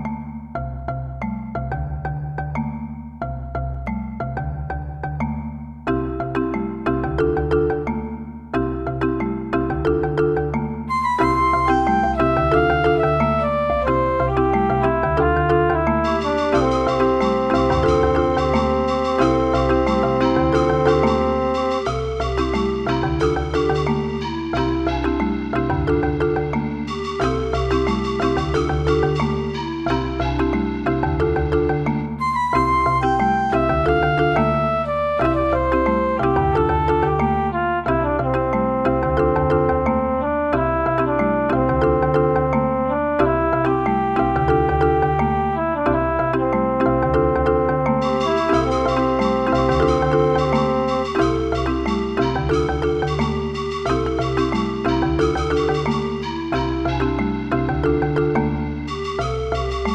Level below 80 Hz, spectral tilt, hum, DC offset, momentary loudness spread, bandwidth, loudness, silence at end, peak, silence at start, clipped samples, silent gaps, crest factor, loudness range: -30 dBFS; -7.5 dB/octave; none; under 0.1%; 8 LU; 9.6 kHz; -20 LUFS; 0 s; -4 dBFS; 0 s; under 0.1%; none; 16 dB; 5 LU